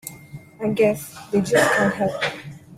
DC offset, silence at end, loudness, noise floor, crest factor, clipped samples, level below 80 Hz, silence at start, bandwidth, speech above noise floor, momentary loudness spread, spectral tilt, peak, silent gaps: under 0.1%; 0 s; -21 LUFS; -41 dBFS; 20 dB; under 0.1%; -56 dBFS; 0.05 s; 16 kHz; 21 dB; 18 LU; -4.5 dB/octave; -2 dBFS; none